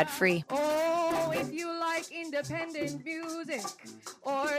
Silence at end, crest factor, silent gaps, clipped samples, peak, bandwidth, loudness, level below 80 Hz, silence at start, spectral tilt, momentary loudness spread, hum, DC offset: 0 s; 22 dB; none; under 0.1%; -10 dBFS; 15.5 kHz; -32 LUFS; -70 dBFS; 0 s; -4 dB/octave; 9 LU; none; under 0.1%